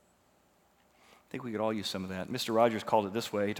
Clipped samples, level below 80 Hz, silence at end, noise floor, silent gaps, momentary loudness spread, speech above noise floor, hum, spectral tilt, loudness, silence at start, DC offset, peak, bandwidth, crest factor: under 0.1%; -76 dBFS; 0 s; -68 dBFS; none; 11 LU; 36 dB; 60 Hz at -55 dBFS; -5 dB/octave; -32 LUFS; 1.35 s; under 0.1%; -12 dBFS; 19.5 kHz; 22 dB